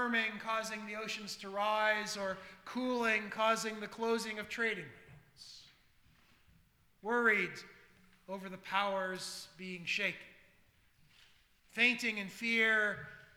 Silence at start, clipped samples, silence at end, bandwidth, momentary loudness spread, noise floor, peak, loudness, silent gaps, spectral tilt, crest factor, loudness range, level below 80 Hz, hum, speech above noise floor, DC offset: 0 s; under 0.1%; 0.1 s; over 20 kHz; 17 LU; -69 dBFS; -16 dBFS; -35 LUFS; none; -3 dB/octave; 22 dB; 5 LU; -74 dBFS; none; 33 dB; under 0.1%